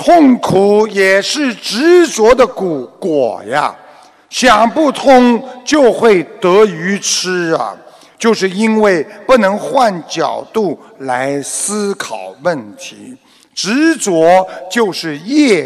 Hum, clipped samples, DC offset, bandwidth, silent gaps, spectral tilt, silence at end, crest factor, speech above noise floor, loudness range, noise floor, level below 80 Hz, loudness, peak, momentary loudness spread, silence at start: none; under 0.1%; under 0.1%; 14.5 kHz; none; -4 dB/octave; 0 s; 12 dB; 29 dB; 6 LU; -41 dBFS; -46 dBFS; -12 LUFS; 0 dBFS; 11 LU; 0 s